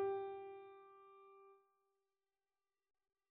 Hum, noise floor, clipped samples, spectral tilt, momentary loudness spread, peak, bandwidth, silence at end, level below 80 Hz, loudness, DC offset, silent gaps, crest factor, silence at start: none; under -90 dBFS; under 0.1%; -4.5 dB/octave; 20 LU; -32 dBFS; 3.8 kHz; 1.75 s; under -90 dBFS; -49 LUFS; under 0.1%; none; 18 dB; 0 s